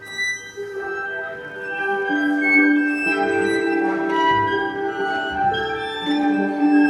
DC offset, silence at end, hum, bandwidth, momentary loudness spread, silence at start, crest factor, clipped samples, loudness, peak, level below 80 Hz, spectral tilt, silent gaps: under 0.1%; 0 s; none; 11 kHz; 12 LU; 0 s; 16 dB; under 0.1%; -20 LUFS; -6 dBFS; -56 dBFS; -4.5 dB/octave; none